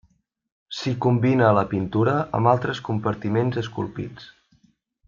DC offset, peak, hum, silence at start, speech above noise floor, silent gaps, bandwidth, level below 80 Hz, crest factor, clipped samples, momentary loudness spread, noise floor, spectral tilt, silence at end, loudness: under 0.1%; -4 dBFS; none; 0.7 s; 42 dB; none; 7.4 kHz; -56 dBFS; 18 dB; under 0.1%; 12 LU; -64 dBFS; -7.5 dB/octave; 0.8 s; -22 LUFS